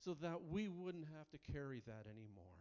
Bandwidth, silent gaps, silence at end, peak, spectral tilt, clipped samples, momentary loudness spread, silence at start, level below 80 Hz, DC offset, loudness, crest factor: 7.2 kHz; none; 0 s; -34 dBFS; -6.5 dB/octave; under 0.1%; 13 LU; 0 s; -66 dBFS; under 0.1%; -50 LUFS; 16 dB